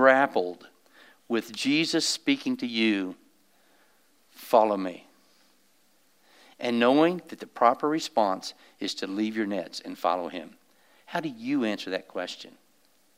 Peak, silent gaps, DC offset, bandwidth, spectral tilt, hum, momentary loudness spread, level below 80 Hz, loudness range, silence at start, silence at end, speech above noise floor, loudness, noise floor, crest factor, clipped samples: -6 dBFS; none; under 0.1%; 16 kHz; -4 dB/octave; none; 15 LU; -86 dBFS; 5 LU; 0 s; 0.7 s; 40 dB; -27 LUFS; -66 dBFS; 22 dB; under 0.1%